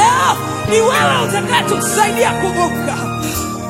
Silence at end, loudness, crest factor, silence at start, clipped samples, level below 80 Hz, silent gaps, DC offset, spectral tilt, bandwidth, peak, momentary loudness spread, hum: 0 s; -15 LUFS; 14 dB; 0 s; under 0.1%; -40 dBFS; none; under 0.1%; -3.5 dB/octave; 16.5 kHz; 0 dBFS; 8 LU; none